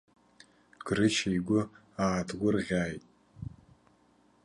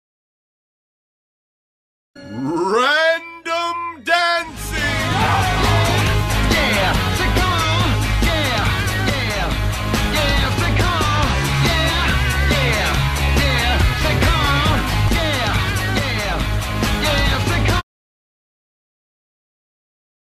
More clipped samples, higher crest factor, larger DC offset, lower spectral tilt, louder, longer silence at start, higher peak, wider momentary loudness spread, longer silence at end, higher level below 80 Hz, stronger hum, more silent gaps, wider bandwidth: neither; about the same, 20 dB vs 16 dB; neither; about the same, -5 dB/octave vs -4.5 dB/octave; second, -30 LUFS vs -17 LUFS; second, 0.85 s vs 2.15 s; second, -14 dBFS vs -2 dBFS; first, 19 LU vs 5 LU; second, 0.95 s vs 2.6 s; second, -56 dBFS vs -26 dBFS; first, 60 Hz at -65 dBFS vs none; neither; second, 11.5 kHz vs 15.5 kHz